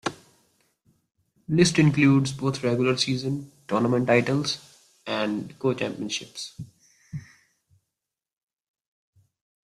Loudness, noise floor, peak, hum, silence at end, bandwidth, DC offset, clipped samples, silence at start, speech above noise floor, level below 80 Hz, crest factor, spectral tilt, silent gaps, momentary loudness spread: -24 LUFS; -87 dBFS; -4 dBFS; none; 2.6 s; 13 kHz; under 0.1%; under 0.1%; 0.05 s; 64 dB; -62 dBFS; 22 dB; -5.5 dB/octave; none; 21 LU